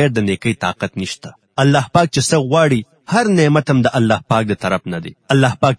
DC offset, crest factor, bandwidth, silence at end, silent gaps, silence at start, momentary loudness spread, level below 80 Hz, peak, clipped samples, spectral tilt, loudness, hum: under 0.1%; 16 dB; 10.5 kHz; 0.05 s; none; 0 s; 11 LU; -48 dBFS; 0 dBFS; under 0.1%; -5.5 dB/octave; -16 LUFS; none